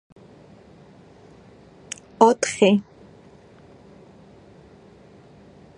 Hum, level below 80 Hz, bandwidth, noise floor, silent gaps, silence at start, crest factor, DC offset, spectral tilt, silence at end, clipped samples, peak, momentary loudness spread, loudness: none; -62 dBFS; 11 kHz; -49 dBFS; none; 2.2 s; 26 dB; under 0.1%; -4.5 dB/octave; 2.95 s; under 0.1%; 0 dBFS; 20 LU; -19 LUFS